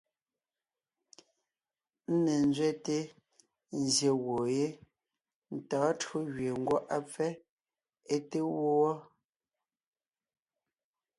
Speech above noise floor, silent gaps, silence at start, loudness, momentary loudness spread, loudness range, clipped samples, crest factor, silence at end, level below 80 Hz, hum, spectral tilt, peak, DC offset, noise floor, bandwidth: over 59 dB; 5.35-5.42 s, 7.50-7.57 s; 2.1 s; -32 LUFS; 14 LU; 4 LU; under 0.1%; 18 dB; 2.15 s; -74 dBFS; none; -5 dB/octave; -16 dBFS; under 0.1%; under -90 dBFS; 11.5 kHz